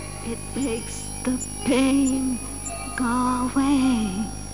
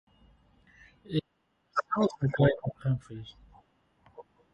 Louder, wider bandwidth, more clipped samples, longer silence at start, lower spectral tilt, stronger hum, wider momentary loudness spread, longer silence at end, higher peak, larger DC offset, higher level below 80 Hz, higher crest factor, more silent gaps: first, -24 LUFS vs -30 LUFS; first, 12 kHz vs 8.2 kHz; neither; second, 0 s vs 1.1 s; second, -4.5 dB/octave vs -8 dB/octave; first, 50 Hz at -40 dBFS vs none; second, 10 LU vs 17 LU; second, 0 s vs 0.3 s; first, -8 dBFS vs -12 dBFS; first, 0.7% vs under 0.1%; first, -40 dBFS vs -60 dBFS; second, 14 dB vs 22 dB; neither